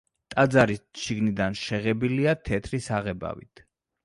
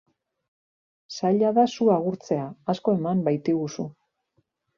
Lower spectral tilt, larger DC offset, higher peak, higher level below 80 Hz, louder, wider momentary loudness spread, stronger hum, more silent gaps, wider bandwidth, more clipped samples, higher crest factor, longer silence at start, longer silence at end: about the same, -6 dB/octave vs -7 dB/octave; neither; about the same, -6 dBFS vs -8 dBFS; first, -50 dBFS vs -68 dBFS; about the same, -26 LUFS vs -24 LUFS; about the same, 11 LU vs 11 LU; neither; neither; first, 11.5 kHz vs 7.2 kHz; neither; about the same, 20 dB vs 18 dB; second, 0.3 s vs 1.1 s; second, 0.65 s vs 0.85 s